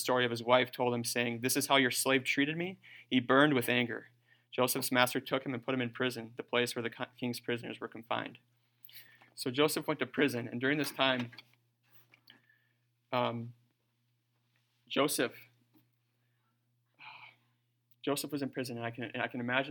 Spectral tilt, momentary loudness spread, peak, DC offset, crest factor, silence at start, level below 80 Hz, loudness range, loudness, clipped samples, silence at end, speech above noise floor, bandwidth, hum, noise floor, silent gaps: -3.5 dB/octave; 16 LU; -8 dBFS; under 0.1%; 26 dB; 0 s; -84 dBFS; 12 LU; -32 LUFS; under 0.1%; 0 s; 45 dB; 19 kHz; none; -78 dBFS; none